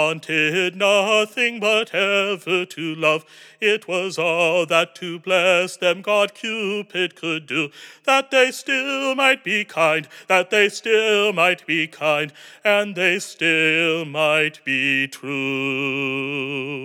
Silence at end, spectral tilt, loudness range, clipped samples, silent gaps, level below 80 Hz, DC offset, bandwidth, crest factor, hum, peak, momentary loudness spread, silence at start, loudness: 0 s; -3.5 dB/octave; 2 LU; under 0.1%; none; under -90 dBFS; under 0.1%; 18 kHz; 18 dB; none; -2 dBFS; 8 LU; 0 s; -19 LUFS